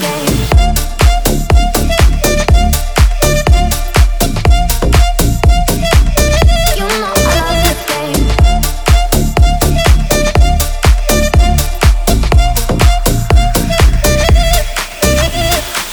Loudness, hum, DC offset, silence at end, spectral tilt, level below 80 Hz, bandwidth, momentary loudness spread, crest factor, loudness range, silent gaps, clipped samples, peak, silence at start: -11 LUFS; none; under 0.1%; 0 s; -4.5 dB/octave; -12 dBFS; over 20 kHz; 3 LU; 10 dB; 1 LU; none; 0.4%; 0 dBFS; 0 s